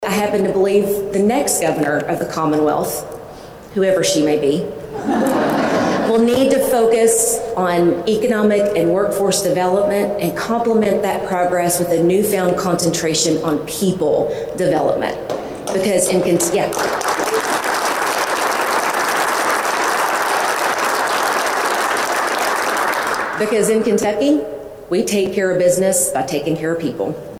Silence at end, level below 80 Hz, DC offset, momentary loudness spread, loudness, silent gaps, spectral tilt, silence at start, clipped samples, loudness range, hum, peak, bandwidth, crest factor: 0 s; -50 dBFS; under 0.1%; 6 LU; -17 LUFS; none; -4 dB/octave; 0 s; under 0.1%; 3 LU; none; -4 dBFS; 17 kHz; 14 dB